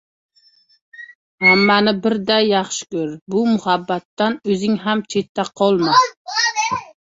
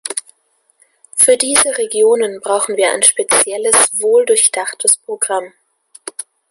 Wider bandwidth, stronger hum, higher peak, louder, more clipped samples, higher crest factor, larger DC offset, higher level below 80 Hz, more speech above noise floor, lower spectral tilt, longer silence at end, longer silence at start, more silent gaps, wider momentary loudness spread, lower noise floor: second, 8 kHz vs 16 kHz; neither; about the same, -2 dBFS vs 0 dBFS; second, -17 LUFS vs -12 LUFS; neither; about the same, 16 dB vs 16 dB; neither; about the same, -60 dBFS vs -60 dBFS; second, 38 dB vs 46 dB; first, -4 dB/octave vs 0.5 dB/octave; about the same, 0.3 s vs 0.3 s; first, 1 s vs 0.05 s; first, 1.15-1.38 s, 3.21-3.26 s, 4.05-4.17 s, 5.29-5.35 s, 6.17-6.25 s vs none; about the same, 12 LU vs 14 LU; second, -56 dBFS vs -60 dBFS